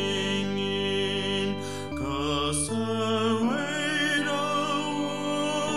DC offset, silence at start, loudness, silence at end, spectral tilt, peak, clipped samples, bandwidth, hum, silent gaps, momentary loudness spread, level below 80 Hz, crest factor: 0.5%; 0 s; -27 LUFS; 0 s; -4 dB/octave; -14 dBFS; under 0.1%; 15 kHz; none; none; 5 LU; -50 dBFS; 14 dB